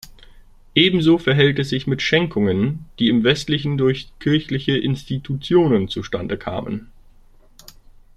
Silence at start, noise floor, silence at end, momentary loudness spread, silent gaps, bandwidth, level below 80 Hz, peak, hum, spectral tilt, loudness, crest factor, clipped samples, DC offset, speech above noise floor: 0.75 s; -48 dBFS; 0.45 s; 10 LU; none; 13 kHz; -46 dBFS; 0 dBFS; none; -6.5 dB/octave; -19 LUFS; 20 dB; under 0.1%; under 0.1%; 30 dB